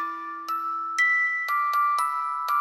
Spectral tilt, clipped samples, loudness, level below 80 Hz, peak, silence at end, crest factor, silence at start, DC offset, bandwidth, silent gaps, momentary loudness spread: 1.5 dB/octave; under 0.1%; -24 LUFS; -82 dBFS; -14 dBFS; 0 s; 12 dB; 0 s; under 0.1%; 17 kHz; none; 10 LU